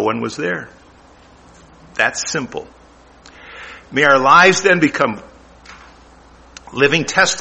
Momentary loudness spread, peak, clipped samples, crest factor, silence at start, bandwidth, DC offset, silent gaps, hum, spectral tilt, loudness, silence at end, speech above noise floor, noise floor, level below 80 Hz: 23 LU; 0 dBFS; under 0.1%; 18 dB; 0 s; 8.8 kHz; under 0.1%; none; none; -3 dB/octave; -14 LUFS; 0 s; 31 dB; -46 dBFS; -50 dBFS